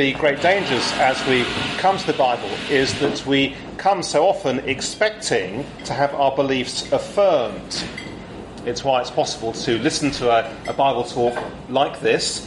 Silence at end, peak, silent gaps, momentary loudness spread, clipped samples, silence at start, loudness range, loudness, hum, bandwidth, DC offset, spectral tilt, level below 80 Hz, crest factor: 0 s; -4 dBFS; none; 9 LU; under 0.1%; 0 s; 3 LU; -20 LUFS; none; 11.5 kHz; under 0.1%; -3.5 dB/octave; -48 dBFS; 16 dB